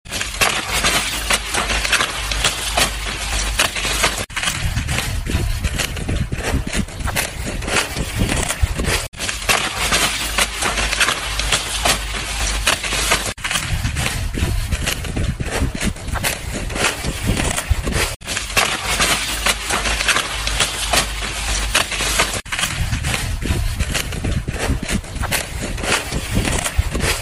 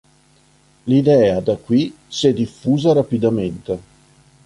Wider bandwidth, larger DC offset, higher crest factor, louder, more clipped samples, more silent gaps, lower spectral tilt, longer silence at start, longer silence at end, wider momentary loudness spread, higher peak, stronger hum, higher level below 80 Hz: first, 16 kHz vs 11.5 kHz; neither; about the same, 20 dB vs 16 dB; about the same, -19 LUFS vs -17 LUFS; neither; first, 9.08-9.12 s, 18.16-18.20 s vs none; second, -2.5 dB/octave vs -7 dB/octave; second, 0.05 s vs 0.85 s; second, 0 s vs 0.65 s; second, 6 LU vs 13 LU; about the same, 0 dBFS vs -2 dBFS; neither; first, -26 dBFS vs -50 dBFS